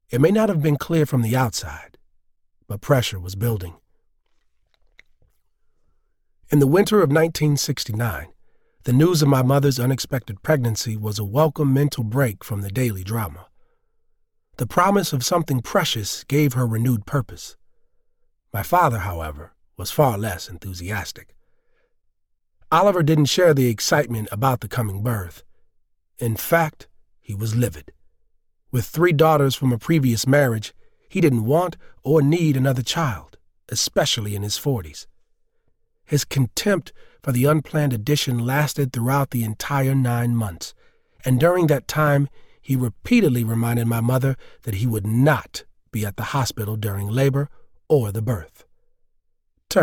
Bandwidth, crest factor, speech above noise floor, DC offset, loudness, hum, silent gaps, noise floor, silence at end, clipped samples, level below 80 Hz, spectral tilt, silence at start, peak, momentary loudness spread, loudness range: 18.5 kHz; 18 dB; 47 dB; under 0.1%; -21 LUFS; none; none; -67 dBFS; 0 s; under 0.1%; -48 dBFS; -5.5 dB/octave; 0.1 s; -4 dBFS; 13 LU; 6 LU